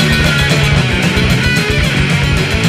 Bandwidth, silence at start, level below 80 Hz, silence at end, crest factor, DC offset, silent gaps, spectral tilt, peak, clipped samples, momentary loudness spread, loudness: 15.5 kHz; 0 s; -22 dBFS; 0 s; 12 dB; under 0.1%; none; -5 dB/octave; 0 dBFS; under 0.1%; 2 LU; -11 LUFS